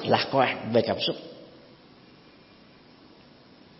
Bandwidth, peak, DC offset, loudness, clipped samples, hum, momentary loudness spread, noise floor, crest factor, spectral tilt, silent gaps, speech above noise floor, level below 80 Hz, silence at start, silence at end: 6 kHz; -6 dBFS; under 0.1%; -25 LUFS; under 0.1%; none; 20 LU; -54 dBFS; 24 dB; -8 dB/octave; none; 29 dB; -68 dBFS; 0 s; 2.3 s